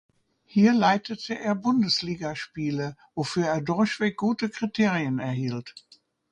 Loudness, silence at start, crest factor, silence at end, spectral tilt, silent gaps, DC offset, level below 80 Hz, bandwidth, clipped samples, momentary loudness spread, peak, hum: -26 LUFS; 0.55 s; 18 dB; 0.55 s; -5.5 dB/octave; none; under 0.1%; -64 dBFS; 9.6 kHz; under 0.1%; 11 LU; -8 dBFS; none